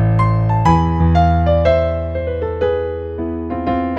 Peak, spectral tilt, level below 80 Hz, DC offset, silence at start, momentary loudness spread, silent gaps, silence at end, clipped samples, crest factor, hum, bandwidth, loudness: -2 dBFS; -9 dB/octave; -26 dBFS; under 0.1%; 0 s; 9 LU; none; 0 s; under 0.1%; 14 dB; none; 7.8 kHz; -16 LUFS